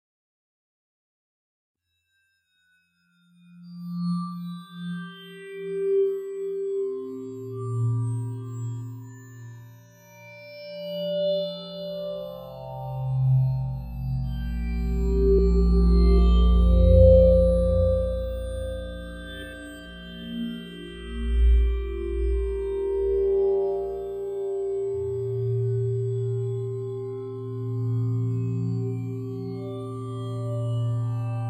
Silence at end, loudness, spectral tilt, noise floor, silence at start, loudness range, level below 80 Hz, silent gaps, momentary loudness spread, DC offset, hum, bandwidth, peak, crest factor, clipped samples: 0 s; -26 LUFS; -9 dB/octave; -72 dBFS; 3.55 s; 14 LU; -28 dBFS; none; 18 LU; under 0.1%; none; 9.2 kHz; -4 dBFS; 22 dB; under 0.1%